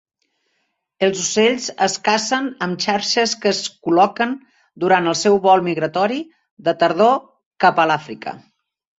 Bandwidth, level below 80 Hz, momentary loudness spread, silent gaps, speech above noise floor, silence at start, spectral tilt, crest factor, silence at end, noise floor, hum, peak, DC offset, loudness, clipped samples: 8.4 kHz; -64 dBFS; 9 LU; 6.51-6.57 s, 7.46-7.51 s; 53 dB; 1 s; -3.5 dB/octave; 18 dB; 0.6 s; -71 dBFS; none; -2 dBFS; under 0.1%; -18 LUFS; under 0.1%